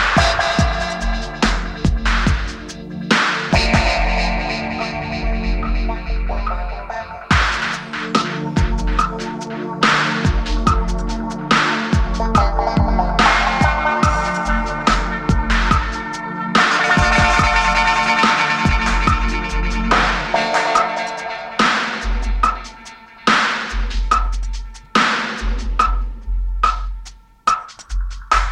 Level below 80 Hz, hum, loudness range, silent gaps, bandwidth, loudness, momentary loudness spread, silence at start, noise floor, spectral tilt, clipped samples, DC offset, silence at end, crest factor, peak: -22 dBFS; none; 6 LU; none; 10.5 kHz; -18 LUFS; 12 LU; 0 s; -39 dBFS; -4.5 dB/octave; under 0.1%; under 0.1%; 0 s; 16 dB; 0 dBFS